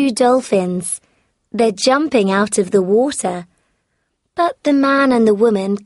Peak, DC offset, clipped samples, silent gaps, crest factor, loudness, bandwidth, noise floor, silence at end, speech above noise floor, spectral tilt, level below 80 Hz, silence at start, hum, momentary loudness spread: -2 dBFS; under 0.1%; under 0.1%; none; 14 dB; -15 LUFS; 11.5 kHz; -69 dBFS; 0.05 s; 54 dB; -4.5 dB/octave; -58 dBFS; 0 s; none; 11 LU